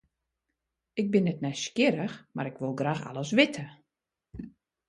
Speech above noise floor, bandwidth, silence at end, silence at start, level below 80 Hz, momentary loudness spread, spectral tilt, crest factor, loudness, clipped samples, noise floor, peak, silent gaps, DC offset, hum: 58 dB; 11.5 kHz; 0.4 s; 0.95 s; -64 dBFS; 21 LU; -5.5 dB/octave; 22 dB; -29 LUFS; under 0.1%; -86 dBFS; -8 dBFS; none; under 0.1%; none